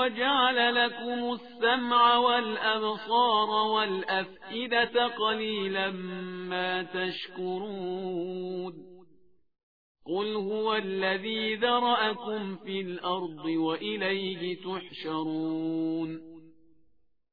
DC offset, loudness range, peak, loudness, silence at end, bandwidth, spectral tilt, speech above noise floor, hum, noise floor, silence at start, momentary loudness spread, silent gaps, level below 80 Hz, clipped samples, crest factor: 0.1%; 9 LU; -10 dBFS; -28 LUFS; 0.85 s; 5 kHz; -7 dB/octave; 39 dB; none; -68 dBFS; 0 s; 11 LU; 9.63-9.95 s; -72 dBFS; under 0.1%; 20 dB